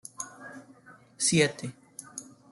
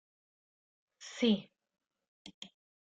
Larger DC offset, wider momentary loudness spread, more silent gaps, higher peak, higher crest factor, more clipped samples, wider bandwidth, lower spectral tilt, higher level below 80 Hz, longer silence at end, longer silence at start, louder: neither; about the same, 23 LU vs 24 LU; second, none vs 2.08-2.25 s, 2.34-2.42 s; first, -10 dBFS vs -18 dBFS; about the same, 22 dB vs 22 dB; neither; first, 12.5 kHz vs 9 kHz; second, -3.5 dB/octave vs -5 dB/octave; first, -70 dBFS vs -80 dBFS; about the same, 0.3 s vs 0.4 s; second, 0.2 s vs 1 s; first, -27 LUFS vs -33 LUFS